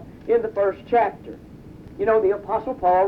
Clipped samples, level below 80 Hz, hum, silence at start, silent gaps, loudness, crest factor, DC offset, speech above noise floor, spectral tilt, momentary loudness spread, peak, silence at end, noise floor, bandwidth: under 0.1%; -50 dBFS; none; 0 s; none; -22 LUFS; 14 dB; under 0.1%; 21 dB; -8 dB/octave; 21 LU; -8 dBFS; 0 s; -41 dBFS; 5.4 kHz